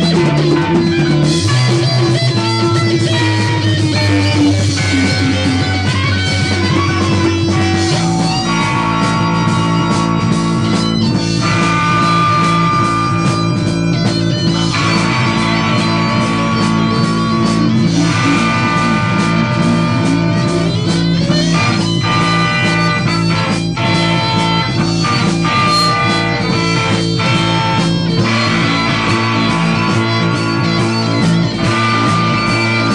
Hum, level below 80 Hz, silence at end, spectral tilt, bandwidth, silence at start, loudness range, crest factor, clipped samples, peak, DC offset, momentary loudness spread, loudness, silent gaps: none; -36 dBFS; 0 s; -5.5 dB/octave; 11 kHz; 0 s; 1 LU; 12 dB; under 0.1%; 0 dBFS; under 0.1%; 2 LU; -13 LUFS; none